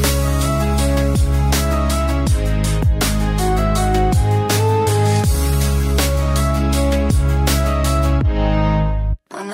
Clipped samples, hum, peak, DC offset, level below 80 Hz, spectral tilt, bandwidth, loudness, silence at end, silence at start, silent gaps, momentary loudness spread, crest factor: under 0.1%; none; -2 dBFS; under 0.1%; -18 dBFS; -5.5 dB/octave; 16.5 kHz; -17 LUFS; 0 s; 0 s; none; 2 LU; 12 dB